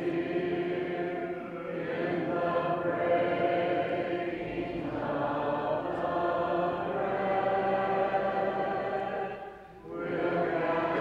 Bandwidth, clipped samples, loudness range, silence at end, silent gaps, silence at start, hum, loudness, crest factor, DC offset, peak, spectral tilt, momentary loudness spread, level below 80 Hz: 7 kHz; under 0.1%; 2 LU; 0 s; none; 0 s; none; -31 LUFS; 14 dB; under 0.1%; -16 dBFS; -8 dB/octave; 8 LU; -60 dBFS